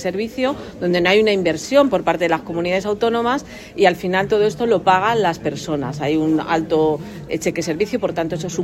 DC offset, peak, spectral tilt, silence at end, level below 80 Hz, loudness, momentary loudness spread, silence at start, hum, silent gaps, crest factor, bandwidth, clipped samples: under 0.1%; 0 dBFS; -5 dB/octave; 0 s; -48 dBFS; -19 LUFS; 8 LU; 0 s; none; none; 18 dB; 15.5 kHz; under 0.1%